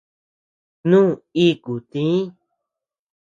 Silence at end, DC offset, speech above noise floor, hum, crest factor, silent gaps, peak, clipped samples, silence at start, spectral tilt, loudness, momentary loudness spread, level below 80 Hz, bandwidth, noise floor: 1.05 s; under 0.1%; 67 dB; none; 18 dB; none; -4 dBFS; under 0.1%; 0.85 s; -7.5 dB/octave; -19 LUFS; 12 LU; -64 dBFS; 7.6 kHz; -85 dBFS